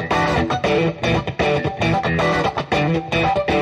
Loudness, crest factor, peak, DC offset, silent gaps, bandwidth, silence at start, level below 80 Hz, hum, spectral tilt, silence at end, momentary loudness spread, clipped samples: -19 LUFS; 14 dB; -6 dBFS; under 0.1%; none; 12.5 kHz; 0 s; -36 dBFS; none; -6 dB/octave; 0 s; 2 LU; under 0.1%